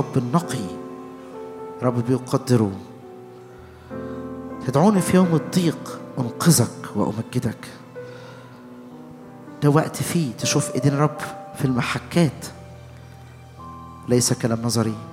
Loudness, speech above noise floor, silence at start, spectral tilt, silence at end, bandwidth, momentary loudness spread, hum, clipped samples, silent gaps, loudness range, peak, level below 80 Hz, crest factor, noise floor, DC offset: -22 LUFS; 22 dB; 0 s; -5.5 dB/octave; 0 s; 16.5 kHz; 24 LU; none; under 0.1%; none; 5 LU; -2 dBFS; -58 dBFS; 20 dB; -42 dBFS; under 0.1%